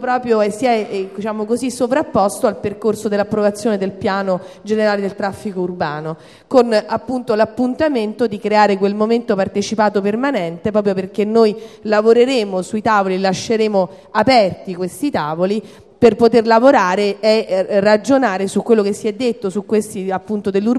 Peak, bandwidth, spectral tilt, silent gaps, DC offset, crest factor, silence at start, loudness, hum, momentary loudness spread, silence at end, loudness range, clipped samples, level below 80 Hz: 0 dBFS; 13 kHz; -5.5 dB/octave; none; under 0.1%; 16 dB; 0 s; -16 LUFS; none; 9 LU; 0 s; 5 LU; under 0.1%; -54 dBFS